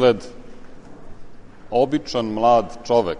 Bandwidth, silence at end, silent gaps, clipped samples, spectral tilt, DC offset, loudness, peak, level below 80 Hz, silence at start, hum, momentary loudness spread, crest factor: 10 kHz; 0 s; none; under 0.1%; -6 dB/octave; under 0.1%; -20 LUFS; -4 dBFS; -44 dBFS; 0 s; none; 9 LU; 18 dB